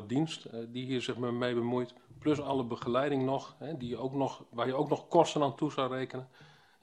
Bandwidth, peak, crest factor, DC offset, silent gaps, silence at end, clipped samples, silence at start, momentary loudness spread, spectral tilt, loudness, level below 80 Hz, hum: 11 kHz; -10 dBFS; 22 dB; under 0.1%; none; 0.35 s; under 0.1%; 0 s; 12 LU; -6 dB/octave; -33 LUFS; -70 dBFS; none